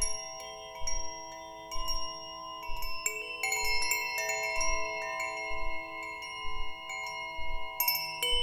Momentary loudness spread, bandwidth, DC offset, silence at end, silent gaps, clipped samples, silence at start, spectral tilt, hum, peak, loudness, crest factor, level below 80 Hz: 12 LU; 20 kHz; under 0.1%; 0 s; none; under 0.1%; 0 s; 0 dB/octave; none; -14 dBFS; -34 LUFS; 18 dB; -44 dBFS